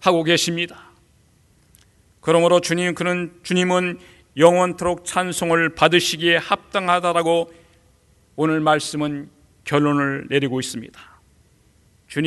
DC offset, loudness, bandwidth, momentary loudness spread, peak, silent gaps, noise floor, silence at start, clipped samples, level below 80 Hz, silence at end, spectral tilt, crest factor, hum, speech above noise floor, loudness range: under 0.1%; -19 LUFS; 12 kHz; 13 LU; 0 dBFS; none; -57 dBFS; 0 s; under 0.1%; -56 dBFS; 0 s; -4.5 dB/octave; 20 dB; none; 38 dB; 4 LU